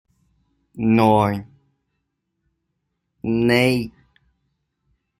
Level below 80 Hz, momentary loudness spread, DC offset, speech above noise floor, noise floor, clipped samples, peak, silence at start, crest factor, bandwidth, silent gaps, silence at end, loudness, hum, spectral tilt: -54 dBFS; 15 LU; under 0.1%; 58 dB; -75 dBFS; under 0.1%; -2 dBFS; 0.75 s; 20 dB; 15.5 kHz; none; 1.3 s; -19 LUFS; none; -6.5 dB/octave